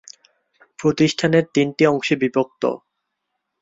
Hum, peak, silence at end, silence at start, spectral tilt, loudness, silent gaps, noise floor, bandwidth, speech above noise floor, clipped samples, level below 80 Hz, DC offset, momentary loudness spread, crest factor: none; -2 dBFS; 0.85 s; 0.8 s; -5.5 dB/octave; -19 LUFS; none; -77 dBFS; 7.8 kHz; 59 dB; under 0.1%; -60 dBFS; under 0.1%; 7 LU; 18 dB